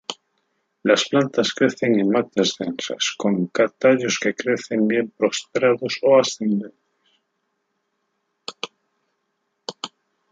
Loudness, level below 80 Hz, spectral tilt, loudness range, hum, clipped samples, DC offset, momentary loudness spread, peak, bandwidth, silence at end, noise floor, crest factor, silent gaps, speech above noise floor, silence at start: -20 LUFS; -70 dBFS; -4 dB/octave; 17 LU; none; under 0.1%; under 0.1%; 18 LU; -2 dBFS; 9.2 kHz; 0.45 s; -74 dBFS; 20 dB; none; 54 dB; 0.1 s